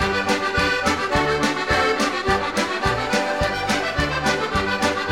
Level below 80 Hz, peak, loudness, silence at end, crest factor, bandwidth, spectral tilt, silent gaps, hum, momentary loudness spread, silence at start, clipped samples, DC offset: -36 dBFS; -4 dBFS; -20 LUFS; 0 s; 18 dB; 16 kHz; -4 dB/octave; none; none; 3 LU; 0 s; under 0.1%; 0.3%